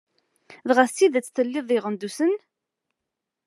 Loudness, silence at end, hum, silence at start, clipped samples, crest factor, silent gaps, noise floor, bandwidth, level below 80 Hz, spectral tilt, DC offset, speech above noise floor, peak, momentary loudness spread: -23 LUFS; 1.1 s; none; 0.5 s; under 0.1%; 22 dB; none; -84 dBFS; 13 kHz; under -90 dBFS; -4 dB/octave; under 0.1%; 62 dB; -2 dBFS; 11 LU